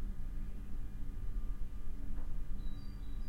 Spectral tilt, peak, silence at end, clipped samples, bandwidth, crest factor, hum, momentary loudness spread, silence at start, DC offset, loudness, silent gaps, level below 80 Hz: -7.5 dB/octave; -26 dBFS; 0 s; under 0.1%; 5 kHz; 10 dB; none; 3 LU; 0 s; under 0.1%; -48 LUFS; none; -40 dBFS